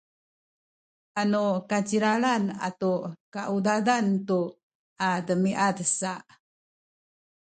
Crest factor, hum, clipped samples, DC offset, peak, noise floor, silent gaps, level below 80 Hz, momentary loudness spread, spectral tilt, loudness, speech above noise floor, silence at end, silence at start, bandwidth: 20 dB; none; under 0.1%; under 0.1%; -8 dBFS; under -90 dBFS; 3.20-3.32 s, 4.63-4.96 s; -72 dBFS; 10 LU; -5 dB/octave; -26 LUFS; over 64 dB; 1.35 s; 1.15 s; 9.4 kHz